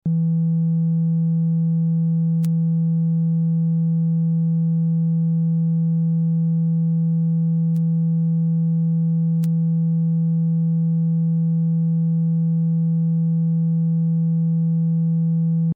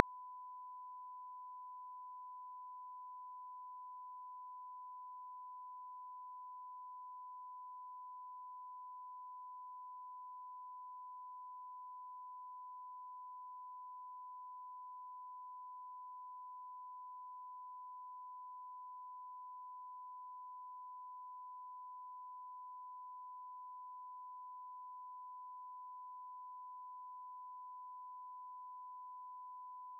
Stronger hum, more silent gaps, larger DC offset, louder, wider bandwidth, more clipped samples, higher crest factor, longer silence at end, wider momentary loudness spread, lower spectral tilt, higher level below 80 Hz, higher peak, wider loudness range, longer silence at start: neither; neither; neither; first, -20 LUFS vs -52 LUFS; about the same, 1.2 kHz vs 1.1 kHz; neither; second, 4 dB vs 44 dB; about the same, 0 s vs 0 s; about the same, 0 LU vs 0 LU; first, -15 dB/octave vs 17 dB/octave; first, -70 dBFS vs under -90 dBFS; second, -14 dBFS vs -6 dBFS; about the same, 0 LU vs 0 LU; about the same, 0.05 s vs 0 s